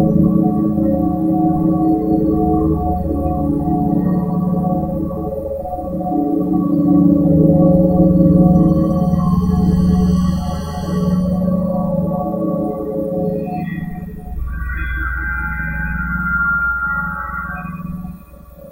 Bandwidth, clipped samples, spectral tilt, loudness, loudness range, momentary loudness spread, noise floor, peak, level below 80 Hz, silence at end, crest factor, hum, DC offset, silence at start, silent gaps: 16 kHz; under 0.1%; -9.5 dB/octave; -16 LUFS; 9 LU; 12 LU; -38 dBFS; 0 dBFS; -28 dBFS; 0 s; 16 dB; none; under 0.1%; 0 s; none